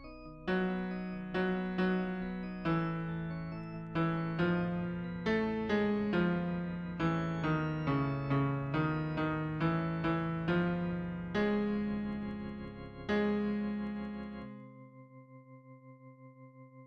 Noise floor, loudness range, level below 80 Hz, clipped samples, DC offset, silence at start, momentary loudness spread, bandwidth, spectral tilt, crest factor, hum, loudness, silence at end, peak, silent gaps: -55 dBFS; 5 LU; -56 dBFS; under 0.1%; under 0.1%; 0 s; 14 LU; 7 kHz; -8.5 dB/octave; 16 dB; none; -35 LUFS; 0 s; -20 dBFS; none